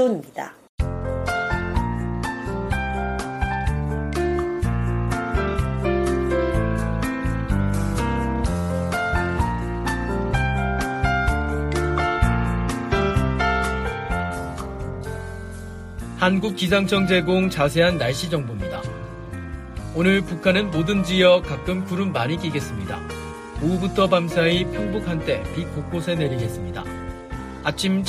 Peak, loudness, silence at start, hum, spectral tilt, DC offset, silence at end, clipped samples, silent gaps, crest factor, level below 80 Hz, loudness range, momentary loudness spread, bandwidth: -4 dBFS; -23 LUFS; 0 s; none; -6 dB/octave; under 0.1%; 0 s; under 0.1%; 0.69-0.78 s; 18 dB; -32 dBFS; 4 LU; 13 LU; 15 kHz